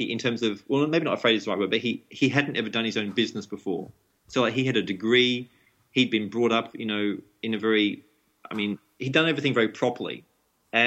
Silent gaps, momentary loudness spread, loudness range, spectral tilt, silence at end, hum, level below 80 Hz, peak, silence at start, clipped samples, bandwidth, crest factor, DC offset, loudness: none; 11 LU; 2 LU; -5 dB/octave; 0 s; none; -72 dBFS; -6 dBFS; 0 s; under 0.1%; 8.4 kHz; 20 dB; under 0.1%; -25 LUFS